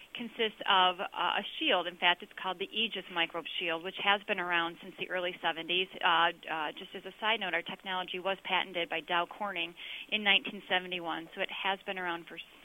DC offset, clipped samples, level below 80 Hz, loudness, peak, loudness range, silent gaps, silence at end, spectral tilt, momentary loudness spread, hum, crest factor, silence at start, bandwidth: under 0.1%; under 0.1%; -74 dBFS; -32 LUFS; -12 dBFS; 3 LU; none; 0.05 s; -4 dB/octave; 10 LU; none; 22 dB; 0 s; 16.5 kHz